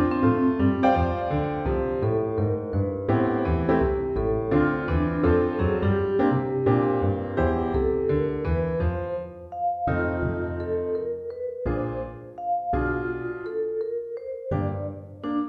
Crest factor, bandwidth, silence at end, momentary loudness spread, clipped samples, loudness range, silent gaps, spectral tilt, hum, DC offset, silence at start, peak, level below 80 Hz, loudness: 16 dB; 5.8 kHz; 0 s; 10 LU; under 0.1%; 6 LU; none; -10.5 dB/octave; none; under 0.1%; 0 s; -8 dBFS; -38 dBFS; -25 LUFS